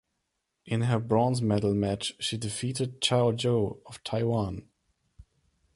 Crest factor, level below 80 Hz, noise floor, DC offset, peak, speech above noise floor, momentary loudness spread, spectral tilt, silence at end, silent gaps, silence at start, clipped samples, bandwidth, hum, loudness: 18 dB; -54 dBFS; -80 dBFS; under 0.1%; -12 dBFS; 53 dB; 9 LU; -5.5 dB/octave; 0.55 s; none; 0.65 s; under 0.1%; 11.5 kHz; none; -28 LUFS